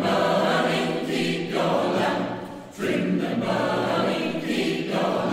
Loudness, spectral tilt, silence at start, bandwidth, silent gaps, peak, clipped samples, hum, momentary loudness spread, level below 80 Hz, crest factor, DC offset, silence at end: -24 LUFS; -5.5 dB/octave; 0 s; 16 kHz; none; -8 dBFS; under 0.1%; none; 6 LU; -60 dBFS; 16 dB; under 0.1%; 0 s